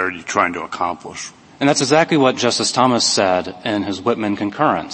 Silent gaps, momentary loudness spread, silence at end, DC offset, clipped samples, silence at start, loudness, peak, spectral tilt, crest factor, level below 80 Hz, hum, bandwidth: none; 9 LU; 0 s; under 0.1%; under 0.1%; 0 s; -17 LUFS; 0 dBFS; -3.5 dB/octave; 18 dB; -58 dBFS; none; 8.8 kHz